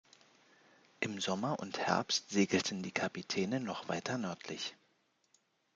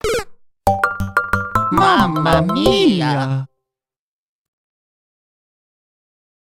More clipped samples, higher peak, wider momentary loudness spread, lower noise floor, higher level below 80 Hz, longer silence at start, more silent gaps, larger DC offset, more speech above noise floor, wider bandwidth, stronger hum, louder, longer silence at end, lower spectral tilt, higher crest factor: neither; second, -14 dBFS vs 0 dBFS; about the same, 9 LU vs 9 LU; second, -75 dBFS vs -85 dBFS; second, -80 dBFS vs -38 dBFS; first, 1 s vs 0.05 s; neither; neither; second, 39 dB vs 71 dB; second, 9.4 kHz vs 17 kHz; neither; second, -36 LUFS vs -16 LUFS; second, 1 s vs 3.1 s; second, -4 dB/octave vs -5.5 dB/octave; first, 24 dB vs 18 dB